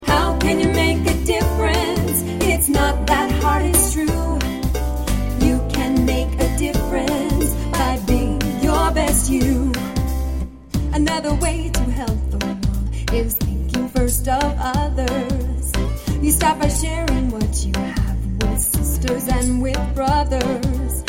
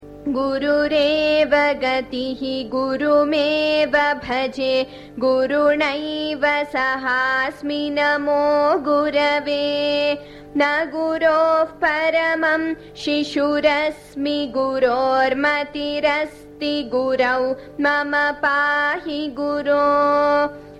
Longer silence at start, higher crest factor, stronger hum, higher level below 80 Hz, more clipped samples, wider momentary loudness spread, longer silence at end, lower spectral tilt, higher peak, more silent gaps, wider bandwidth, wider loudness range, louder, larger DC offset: about the same, 0 s vs 0 s; about the same, 16 dB vs 16 dB; neither; first, -22 dBFS vs -52 dBFS; neither; about the same, 6 LU vs 7 LU; about the same, 0 s vs 0 s; about the same, -5 dB/octave vs -4.5 dB/octave; about the same, -2 dBFS vs -4 dBFS; neither; first, 17 kHz vs 11 kHz; about the same, 3 LU vs 1 LU; about the same, -19 LUFS vs -19 LUFS; neither